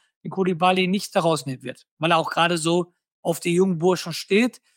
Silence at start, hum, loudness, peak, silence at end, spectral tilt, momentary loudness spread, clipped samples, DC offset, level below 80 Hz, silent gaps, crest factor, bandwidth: 0.25 s; none; -22 LUFS; -4 dBFS; 0.25 s; -5 dB/octave; 13 LU; under 0.1%; under 0.1%; -72 dBFS; 1.91-1.97 s, 3.12-3.23 s; 18 dB; 17 kHz